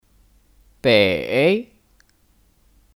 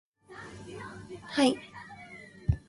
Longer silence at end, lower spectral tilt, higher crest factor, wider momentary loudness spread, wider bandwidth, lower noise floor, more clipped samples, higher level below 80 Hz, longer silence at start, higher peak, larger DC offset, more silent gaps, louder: first, 1.35 s vs 0.1 s; about the same, -6 dB/octave vs -5.5 dB/octave; about the same, 20 dB vs 22 dB; second, 8 LU vs 20 LU; first, 16 kHz vs 11.5 kHz; first, -59 dBFS vs -49 dBFS; neither; second, -54 dBFS vs -46 dBFS; first, 0.85 s vs 0.3 s; first, -4 dBFS vs -12 dBFS; neither; neither; first, -18 LUFS vs -31 LUFS